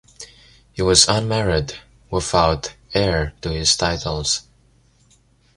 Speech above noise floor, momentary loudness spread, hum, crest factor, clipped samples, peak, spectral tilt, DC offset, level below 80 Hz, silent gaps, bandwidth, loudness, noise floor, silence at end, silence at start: 37 dB; 22 LU; none; 22 dB; under 0.1%; 0 dBFS; -3 dB/octave; under 0.1%; -36 dBFS; none; 14 kHz; -19 LUFS; -57 dBFS; 1.15 s; 0.2 s